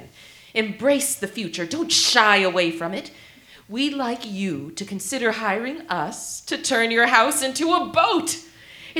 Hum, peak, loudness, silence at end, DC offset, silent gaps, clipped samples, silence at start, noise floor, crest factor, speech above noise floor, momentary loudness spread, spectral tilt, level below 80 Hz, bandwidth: none; 0 dBFS; -21 LUFS; 0 s; under 0.1%; none; under 0.1%; 0 s; -47 dBFS; 22 dB; 25 dB; 14 LU; -2 dB/octave; -64 dBFS; over 20 kHz